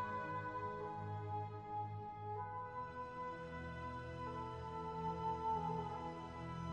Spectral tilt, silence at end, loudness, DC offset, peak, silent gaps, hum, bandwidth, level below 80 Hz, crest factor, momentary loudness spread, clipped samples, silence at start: -7.5 dB/octave; 0 s; -45 LUFS; under 0.1%; -30 dBFS; none; none; 9.8 kHz; -62 dBFS; 14 dB; 7 LU; under 0.1%; 0 s